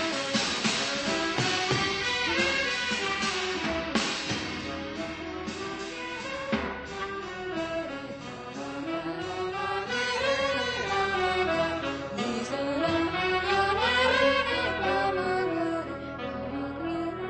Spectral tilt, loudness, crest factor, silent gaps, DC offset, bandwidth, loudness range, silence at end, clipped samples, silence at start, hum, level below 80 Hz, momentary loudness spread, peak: -3.5 dB/octave; -28 LUFS; 18 dB; none; under 0.1%; 8.8 kHz; 8 LU; 0 s; under 0.1%; 0 s; none; -52 dBFS; 10 LU; -10 dBFS